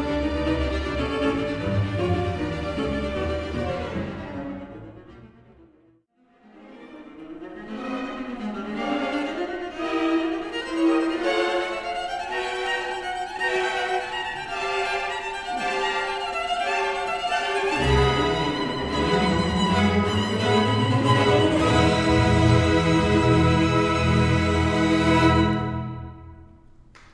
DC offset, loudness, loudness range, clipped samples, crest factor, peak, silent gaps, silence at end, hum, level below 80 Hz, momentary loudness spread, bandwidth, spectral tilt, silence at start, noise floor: under 0.1%; -23 LUFS; 15 LU; under 0.1%; 18 dB; -4 dBFS; none; 0.7 s; none; -38 dBFS; 12 LU; 11 kHz; -6 dB/octave; 0 s; -61 dBFS